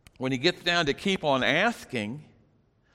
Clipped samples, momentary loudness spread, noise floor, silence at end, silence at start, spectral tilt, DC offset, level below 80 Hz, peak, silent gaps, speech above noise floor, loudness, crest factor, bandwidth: under 0.1%; 10 LU; -65 dBFS; 0.7 s; 0.2 s; -4.5 dB/octave; under 0.1%; -58 dBFS; -10 dBFS; none; 38 dB; -26 LUFS; 18 dB; 15.5 kHz